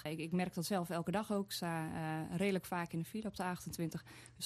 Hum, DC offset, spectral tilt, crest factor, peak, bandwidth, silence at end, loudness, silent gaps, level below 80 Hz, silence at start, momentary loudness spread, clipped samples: none; under 0.1%; -5.5 dB/octave; 16 dB; -22 dBFS; 14.5 kHz; 0 s; -40 LUFS; none; -68 dBFS; 0 s; 6 LU; under 0.1%